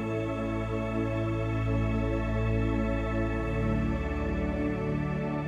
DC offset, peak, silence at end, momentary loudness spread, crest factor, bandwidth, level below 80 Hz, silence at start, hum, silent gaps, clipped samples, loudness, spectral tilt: under 0.1%; -16 dBFS; 0 s; 3 LU; 12 dB; 8.8 kHz; -36 dBFS; 0 s; none; none; under 0.1%; -30 LUFS; -8.5 dB/octave